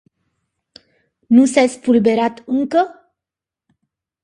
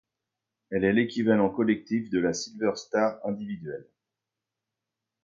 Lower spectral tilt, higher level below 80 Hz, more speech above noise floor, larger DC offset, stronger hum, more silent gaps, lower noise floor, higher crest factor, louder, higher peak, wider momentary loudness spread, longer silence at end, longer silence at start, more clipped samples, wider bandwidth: about the same, -5 dB/octave vs -5.5 dB/octave; about the same, -62 dBFS vs -62 dBFS; first, 73 dB vs 61 dB; neither; neither; neither; about the same, -87 dBFS vs -87 dBFS; about the same, 18 dB vs 20 dB; first, -16 LUFS vs -27 LUFS; first, 0 dBFS vs -10 dBFS; second, 7 LU vs 12 LU; about the same, 1.35 s vs 1.45 s; first, 1.3 s vs 0.7 s; neither; first, 11 kHz vs 7.6 kHz